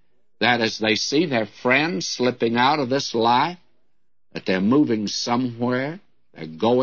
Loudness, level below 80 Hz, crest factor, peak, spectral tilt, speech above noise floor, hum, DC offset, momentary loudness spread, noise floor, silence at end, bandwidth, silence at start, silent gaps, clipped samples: -21 LUFS; -66 dBFS; 18 dB; -4 dBFS; -4.5 dB/octave; 56 dB; none; 0.2%; 9 LU; -77 dBFS; 0 s; 7.4 kHz; 0.4 s; none; under 0.1%